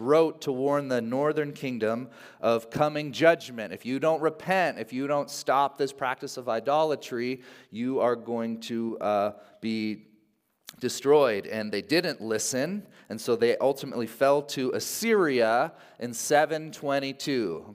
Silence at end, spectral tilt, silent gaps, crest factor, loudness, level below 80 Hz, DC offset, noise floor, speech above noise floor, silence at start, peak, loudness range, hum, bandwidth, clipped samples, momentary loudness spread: 0 s; -4.5 dB/octave; none; 20 dB; -27 LUFS; -76 dBFS; under 0.1%; -69 dBFS; 42 dB; 0 s; -6 dBFS; 3 LU; none; 16 kHz; under 0.1%; 11 LU